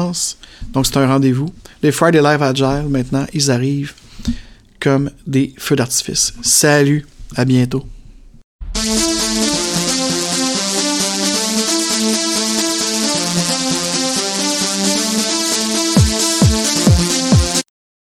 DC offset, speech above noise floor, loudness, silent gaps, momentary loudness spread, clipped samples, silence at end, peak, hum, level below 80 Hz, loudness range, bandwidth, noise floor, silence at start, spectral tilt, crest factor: under 0.1%; 23 dB; -15 LUFS; 8.44-8.59 s; 8 LU; under 0.1%; 0.5 s; 0 dBFS; none; -32 dBFS; 3 LU; 17.5 kHz; -38 dBFS; 0 s; -3.5 dB/octave; 16 dB